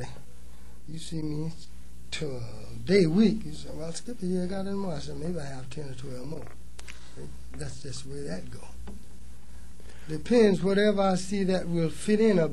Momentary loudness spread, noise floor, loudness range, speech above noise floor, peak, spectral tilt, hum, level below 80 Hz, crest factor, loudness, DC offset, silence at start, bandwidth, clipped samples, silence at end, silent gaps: 23 LU; -49 dBFS; 14 LU; 21 dB; -8 dBFS; -6 dB/octave; none; -48 dBFS; 20 dB; -28 LUFS; 2%; 0 s; 12.5 kHz; under 0.1%; 0 s; none